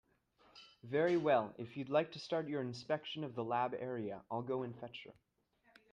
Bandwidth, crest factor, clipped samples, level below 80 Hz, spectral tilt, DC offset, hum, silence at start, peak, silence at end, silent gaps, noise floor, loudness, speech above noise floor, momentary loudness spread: 9.6 kHz; 20 dB; under 0.1%; -80 dBFS; -6.5 dB/octave; under 0.1%; none; 0.55 s; -20 dBFS; 0.8 s; none; -75 dBFS; -38 LUFS; 37 dB; 17 LU